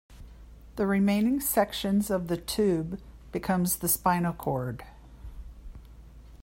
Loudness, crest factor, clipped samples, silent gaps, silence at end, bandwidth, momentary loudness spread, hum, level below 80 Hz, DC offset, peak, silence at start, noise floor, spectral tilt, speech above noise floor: -27 LUFS; 20 dB; under 0.1%; none; 0 s; 16.5 kHz; 22 LU; none; -48 dBFS; under 0.1%; -10 dBFS; 0.1 s; -48 dBFS; -5 dB/octave; 21 dB